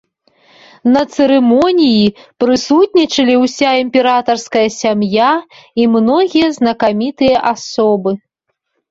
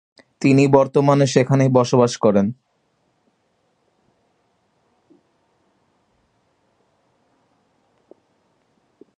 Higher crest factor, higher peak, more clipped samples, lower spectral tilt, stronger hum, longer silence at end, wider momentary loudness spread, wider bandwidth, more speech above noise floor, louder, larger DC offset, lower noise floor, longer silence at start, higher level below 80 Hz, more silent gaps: second, 12 dB vs 22 dB; about the same, 0 dBFS vs 0 dBFS; neither; second, -5 dB/octave vs -6.5 dB/octave; neither; second, 0.75 s vs 6.65 s; about the same, 6 LU vs 7 LU; second, 7.8 kHz vs 9.4 kHz; first, 58 dB vs 51 dB; first, -12 LUFS vs -16 LUFS; neither; first, -70 dBFS vs -66 dBFS; first, 0.85 s vs 0.4 s; first, -52 dBFS vs -60 dBFS; neither